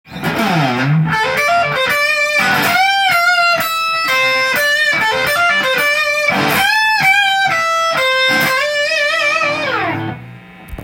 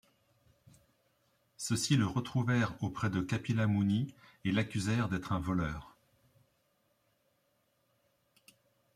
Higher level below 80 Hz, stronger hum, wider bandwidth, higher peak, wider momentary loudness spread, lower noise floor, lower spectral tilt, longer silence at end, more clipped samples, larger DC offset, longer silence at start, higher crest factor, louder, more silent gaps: first, -48 dBFS vs -60 dBFS; neither; first, 17 kHz vs 15 kHz; first, -2 dBFS vs -16 dBFS; second, 4 LU vs 8 LU; second, -35 dBFS vs -76 dBFS; second, -3.5 dB/octave vs -5.5 dB/octave; second, 0 s vs 3.05 s; neither; neither; second, 0.1 s vs 1.6 s; second, 14 dB vs 20 dB; first, -13 LUFS vs -33 LUFS; neither